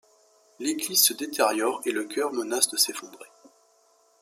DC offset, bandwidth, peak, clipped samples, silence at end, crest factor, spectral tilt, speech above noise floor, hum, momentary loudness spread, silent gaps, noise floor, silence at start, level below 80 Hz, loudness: under 0.1%; 16 kHz; -4 dBFS; under 0.1%; 0.95 s; 24 dB; -0.5 dB/octave; 37 dB; none; 11 LU; none; -63 dBFS; 0.6 s; -80 dBFS; -24 LUFS